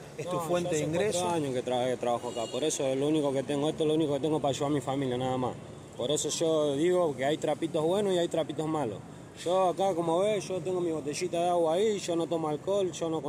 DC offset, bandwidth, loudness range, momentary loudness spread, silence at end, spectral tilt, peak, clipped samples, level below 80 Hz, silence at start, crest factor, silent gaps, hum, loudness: under 0.1%; 16 kHz; 1 LU; 6 LU; 0 s; -5 dB/octave; -16 dBFS; under 0.1%; -64 dBFS; 0 s; 14 dB; none; none; -29 LUFS